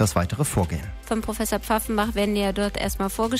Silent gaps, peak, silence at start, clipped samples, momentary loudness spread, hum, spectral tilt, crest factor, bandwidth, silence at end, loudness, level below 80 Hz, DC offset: none; -8 dBFS; 0 s; under 0.1%; 5 LU; none; -5 dB/octave; 16 dB; 16 kHz; 0 s; -25 LUFS; -36 dBFS; under 0.1%